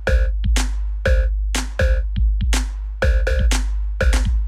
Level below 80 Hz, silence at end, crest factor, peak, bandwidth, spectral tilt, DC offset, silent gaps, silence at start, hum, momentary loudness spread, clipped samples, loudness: -18 dBFS; 0 s; 14 dB; -4 dBFS; 13 kHz; -4.5 dB/octave; under 0.1%; none; 0 s; none; 4 LU; under 0.1%; -21 LUFS